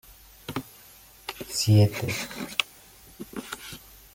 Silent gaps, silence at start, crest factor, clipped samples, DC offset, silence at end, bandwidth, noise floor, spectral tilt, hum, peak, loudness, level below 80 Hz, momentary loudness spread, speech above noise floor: none; 0.1 s; 26 dB; under 0.1%; under 0.1%; 0.35 s; 17 kHz; -52 dBFS; -5 dB/octave; none; -2 dBFS; -27 LUFS; -56 dBFS; 24 LU; 28 dB